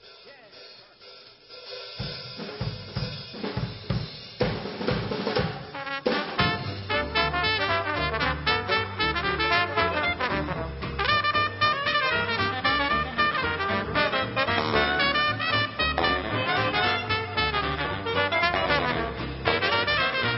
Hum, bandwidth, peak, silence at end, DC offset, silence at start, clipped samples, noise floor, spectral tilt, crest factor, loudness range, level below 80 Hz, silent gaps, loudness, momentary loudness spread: none; 6 kHz; -8 dBFS; 0 s; under 0.1%; 0 s; under 0.1%; -49 dBFS; -8.5 dB/octave; 20 dB; 9 LU; -44 dBFS; none; -25 LUFS; 11 LU